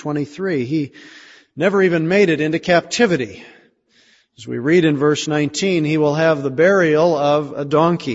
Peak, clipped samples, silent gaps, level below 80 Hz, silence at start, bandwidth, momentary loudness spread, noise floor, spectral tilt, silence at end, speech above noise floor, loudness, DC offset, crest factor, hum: -2 dBFS; under 0.1%; none; -58 dBFS; 0 s; 8 kHz; 8 LU; -55 dBFS; -5.5 dB/octave; 0 s; 39 dB; -17 LUFS; under 0.1%; 16 dB; none